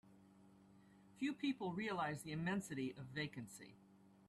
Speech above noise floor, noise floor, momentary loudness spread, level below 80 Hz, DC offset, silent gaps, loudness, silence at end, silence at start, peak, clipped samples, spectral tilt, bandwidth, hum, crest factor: 22 dB; -67 dBFS; 12 LU; -78 dBFS; under 0.1%; none; -45 LUFS; 0.05 s; 0.05 s; -30 dBFS; under 0.1%; -5.5 dB/octave; 13 kHz; none; 16 dB